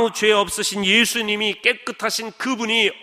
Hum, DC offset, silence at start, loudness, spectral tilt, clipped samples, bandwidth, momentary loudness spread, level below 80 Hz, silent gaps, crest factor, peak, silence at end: none; under 0.1%; 0 s; -19 LUFS; -2 dB/octave; under 0.1%; 15.5 kHz; 8 LU; -58 dBFS; none; 18 dB; -2 dBFS; 0 s